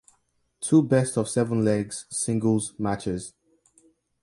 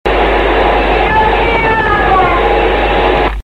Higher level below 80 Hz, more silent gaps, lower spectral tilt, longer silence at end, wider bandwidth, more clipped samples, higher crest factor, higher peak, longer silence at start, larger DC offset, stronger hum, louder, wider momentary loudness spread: second, -56 dBFS vs -20 dBFS; neither; about the same, -6 dB/octave vs -6.5 dB/octave; first, 0.95 s vs 0 s; first, 11.5 kHz vs 8.8 kHz; neither; first, 18 dB vs 10 dB; second, -8 dBFS vs 0 dBFS; first, 0.6 s vs 0.05 s; second, under 0.1% vs 1%; neither; second, -25 LUFS vs -10 LUFS; first, 11 LU vs 1 LU